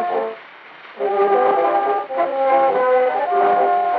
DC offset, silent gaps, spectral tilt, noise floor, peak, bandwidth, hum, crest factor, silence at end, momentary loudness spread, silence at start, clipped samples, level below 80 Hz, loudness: under 0.1%; none; -2 dB/octave; -40 dBFS; -6 dBFS; 4.9 kHz; none; 12 dB; 0 s; 8 LU; 0 s; under 0.1%; -90 dBFS; -17 LUFS